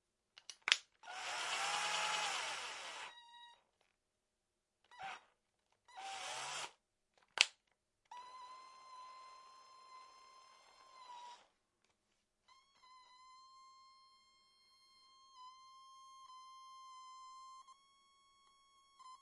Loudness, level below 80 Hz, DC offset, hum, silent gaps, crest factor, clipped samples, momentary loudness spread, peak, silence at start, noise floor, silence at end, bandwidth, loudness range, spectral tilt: -40 LUFS; under -90 dBFS; under 0.1%; none; none; 42 dB; under 0.1%; 27 LU; -6 dBFS; 0.5 s; -88 dBFS; 0.05 s; 11.5 kHz; 21 LU; 2 dB/octave